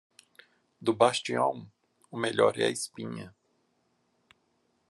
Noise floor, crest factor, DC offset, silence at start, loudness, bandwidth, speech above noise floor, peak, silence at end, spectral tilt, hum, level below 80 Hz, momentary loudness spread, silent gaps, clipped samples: -73 dBFS; 24 dB; under 0.1%; 0.8 s; -28 LUFS; 12.5 kHz; 45 dB; -8 dBFS; 1.6 s; -4 dB/octave; none; -80 dBFS; 18 LU; none; under 0.1%